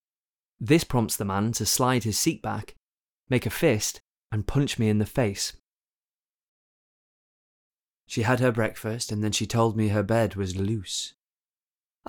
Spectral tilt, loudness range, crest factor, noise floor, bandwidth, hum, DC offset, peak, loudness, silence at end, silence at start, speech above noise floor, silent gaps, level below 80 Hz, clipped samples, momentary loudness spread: -4.5 dB/octave; 5 LU; 20 dB; under -90 dBFS; 19.5 kHz; none; under 0.1%; -6 dBFS; -26 LUFS; 1 s; 0.6 s; over 65 dB; 2.78-2.90 s, 2.97-3.24 s, 4.00-4.14 s, 5.59-5.65 s, 5.78-7.71 s, 7.93-8.00 s; -50 dBFS; under 0.1%; 9 LU